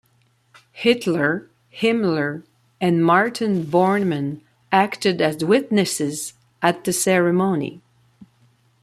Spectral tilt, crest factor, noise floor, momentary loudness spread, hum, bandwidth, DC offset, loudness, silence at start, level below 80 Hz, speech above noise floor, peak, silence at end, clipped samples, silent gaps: -5 dB/octave; 18 dB; -61 dBFS; 10 LU; none; 15 kHz; under 0.1%; -20 LUFS; 0.75 s; -64 dBFS; 42 dB; -2 dBFS; 0.6 s; under 0.1%; none